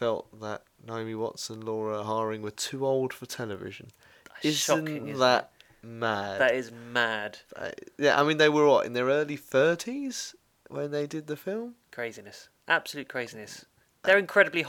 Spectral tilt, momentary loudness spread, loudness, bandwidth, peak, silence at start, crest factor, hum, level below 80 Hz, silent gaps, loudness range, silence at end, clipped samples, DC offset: -3.5 dB/octave; 17 LU; -28 LUFS; 18.5 kHz; -6 dBFS; 0 s; 22 dB; none; -72 dBFS; none; 8 LU; 0 s; under 0.1%; under 0.1%